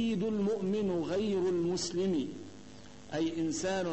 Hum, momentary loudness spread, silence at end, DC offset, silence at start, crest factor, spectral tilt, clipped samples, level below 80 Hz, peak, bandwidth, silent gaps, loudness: none; 18 LU; 0 s; 0.2%; 0 s; 10 dB; -5.5 dB/octave; under 0.1%; -64 dBFS; -22 dBFS; 8.6 kHz; none; -33 LUFS